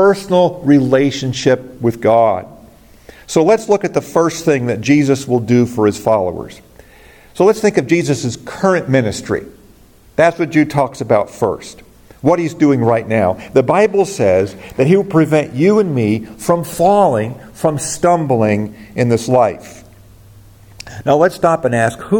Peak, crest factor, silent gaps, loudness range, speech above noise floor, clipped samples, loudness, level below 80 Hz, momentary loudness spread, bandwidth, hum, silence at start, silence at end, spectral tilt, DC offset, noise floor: 0 dBFS; 14 dB; none; 3 LU; 31 dB; under 0.1%; -14 LUFS; -48 dBFS; 8 LU; 17.5 kHz; none; 0 s; 0 s; -6 dB/octave; under 0.1%; -45 dBFS